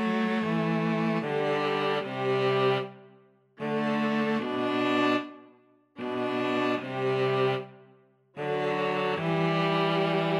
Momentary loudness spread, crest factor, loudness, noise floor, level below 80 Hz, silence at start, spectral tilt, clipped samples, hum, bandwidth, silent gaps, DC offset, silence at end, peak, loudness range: 7 LU; 14 dB; -28 LUFS; -60 dBFS; -76 dBFS; 0 s; -7 dB/octave; under 0.1%; none; 12 kHz; none; under 0.1%; 0 s; -14 dBFS; 2 LU